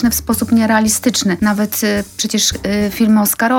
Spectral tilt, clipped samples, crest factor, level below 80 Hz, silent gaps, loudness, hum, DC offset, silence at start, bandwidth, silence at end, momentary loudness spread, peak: -3.5 dB/octave; under 0.1%; 12 dB; -38 dBFS; none; -14 LUFS; none; under 0.1%; 0 s; 18 kHz; 0 s; 5 LU; -2 dBFS